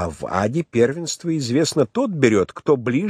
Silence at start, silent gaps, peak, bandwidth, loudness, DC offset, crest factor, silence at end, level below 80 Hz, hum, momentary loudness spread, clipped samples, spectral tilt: 0 s; none; -2 dBFS; 13.5 kHz; -20 LUFS; under 0.1%; 18 dB; 0 s; -52 dBFS; none; 6 LU; under 0.1%; -5.5 dB/octave